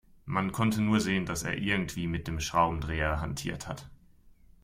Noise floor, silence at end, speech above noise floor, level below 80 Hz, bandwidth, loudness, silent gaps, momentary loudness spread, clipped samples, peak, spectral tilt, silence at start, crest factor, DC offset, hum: -57 dBFS; 0.35 s; 28 dB; -46 dBFS; 16 kHz; -30 LUFS; none; 9 LU; under 0.1%; -14 dBFS; -5 dB/octave; 0.25 s; 18 dB; under 0.1%; none